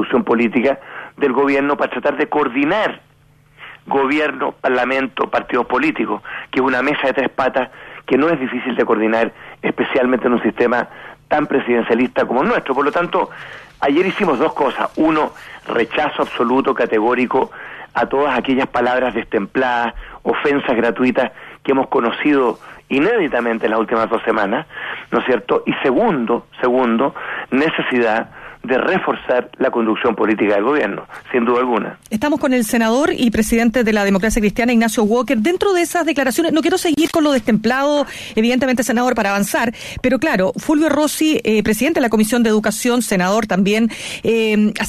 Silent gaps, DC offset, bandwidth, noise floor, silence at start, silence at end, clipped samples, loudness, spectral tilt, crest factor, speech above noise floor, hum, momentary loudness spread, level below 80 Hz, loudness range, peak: none; under 0.1%; 14 kHz; -49 dBFS; 0 s; 0 s; under 0.1%; -17 LUFS; -4.5 dB/octave; 14 dB; 33 dB; none; 6 LU; -44 dBFS; 3 LU; -2 dBFS